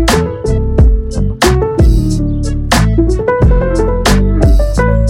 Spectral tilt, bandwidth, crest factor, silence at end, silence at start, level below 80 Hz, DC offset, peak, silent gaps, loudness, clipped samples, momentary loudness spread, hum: -6 dB/octave; 16 kHz; 10 dB; 0 s; 0 s; -12 dBFS; under 0.1%; 0 dBFS; none; -12 LUFS; under 0.1%; 5 LU; none